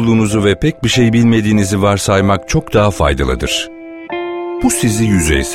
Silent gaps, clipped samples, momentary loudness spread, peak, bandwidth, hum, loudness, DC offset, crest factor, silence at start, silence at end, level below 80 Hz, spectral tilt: none; under 0.1%; 10 LU; 0 dBFS; 16 kHz; none; -13 LUFS; under 0.1%; 12 dB; 0 s; 0 s; -26 dBFS; -5 dB/octave